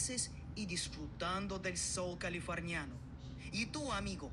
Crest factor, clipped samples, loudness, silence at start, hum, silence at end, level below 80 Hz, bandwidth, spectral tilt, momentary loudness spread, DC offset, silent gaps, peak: 18 dB; under 0.1%; -40 LUFS; 0 s; none; 0 s; -54 dBFS; 12.5 kHz; -3.5 dB/octave; 8 LU; under 0.1%; none; -24 dBFS